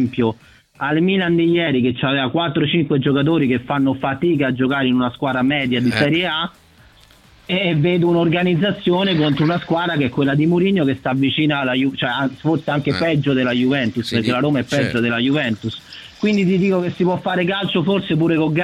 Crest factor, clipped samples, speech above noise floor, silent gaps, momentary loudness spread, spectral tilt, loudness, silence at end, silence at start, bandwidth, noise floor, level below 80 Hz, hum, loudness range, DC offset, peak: 16 dB; under 0.1%; 31 dB; none; 4 LU; -7 dB/octave; -18 LUFS; 0 s; 0 s; 12 kHz; -48 dBFS; -52 dBFS; none; 2 LU; under 0.1%; -2 dBFS